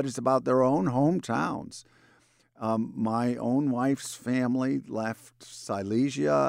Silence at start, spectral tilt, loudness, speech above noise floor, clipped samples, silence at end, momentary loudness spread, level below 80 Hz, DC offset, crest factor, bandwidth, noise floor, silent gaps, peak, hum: 0 s; -6.5 dB/octave; -28 LUFS; 36 dB; under 0.1%; 0 s; 12 LU; -66 dBFS; under 0.1%; 16 dB; 15.5 kHz; -63 dBFS; none; -12 dBFS; none